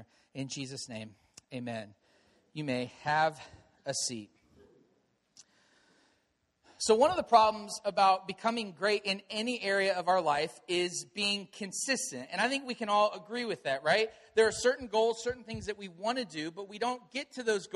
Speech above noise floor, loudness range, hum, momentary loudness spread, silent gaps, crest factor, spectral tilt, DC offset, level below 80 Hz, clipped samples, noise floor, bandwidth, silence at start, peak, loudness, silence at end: 45 dB; 8 LU; none; 14 LU; none; 22 dB; -3 dB/octave; under 0.1%; -68 dBFS; under 0.1%; -76 dBFS; 13 kHz; 0 s; -10 dBFS; -31 LUFS; 0.1 s